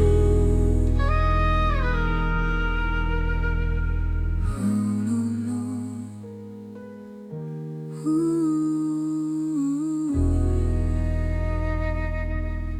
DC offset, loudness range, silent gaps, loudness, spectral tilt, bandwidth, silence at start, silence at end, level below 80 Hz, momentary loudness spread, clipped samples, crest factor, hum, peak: under 0.1%; 5 LU; none; -25 LUFS; -8 dB/octave; 10 kHz; 0 s; 0 s; -26 dBFS; 13 LU; under 0.1%; 14 dB; none; -8 dBFS